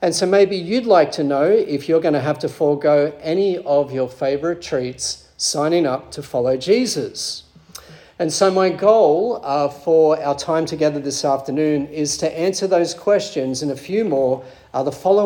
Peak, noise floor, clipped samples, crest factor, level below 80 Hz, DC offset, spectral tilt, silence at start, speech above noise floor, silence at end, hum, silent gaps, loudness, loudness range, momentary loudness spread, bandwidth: -2 dBFS; -41 dBFS; under 0.1%; 16 dB; -58 dBFS; under 0.1%; -4.5 dB/octave; 0 s; 24 dB; 0 s; none; none; -19 LUFS; 4 LU; 9 LU; 17.5 kHz